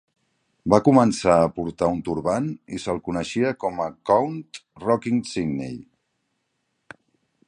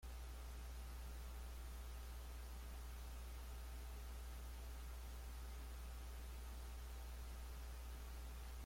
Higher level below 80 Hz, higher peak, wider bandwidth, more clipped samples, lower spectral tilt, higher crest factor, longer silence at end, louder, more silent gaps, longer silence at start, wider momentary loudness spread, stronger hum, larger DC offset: about the same, -52 dBFS vs -52 dBFS; first, 0 dBFS vs -42 dBFS; second, 10.5 kHz vs 16.5 kHz; neither; first, -6.5 dB/octave vs -4.5 dB/octave; first, 22 dB vs 8 dB; first, 1.65 s vs 0 s; first, -22 LUFS vs -54 LUFS; neither; first, 0.65 s vs 0 s; first, 14 LU vs 0 LU; neither; neither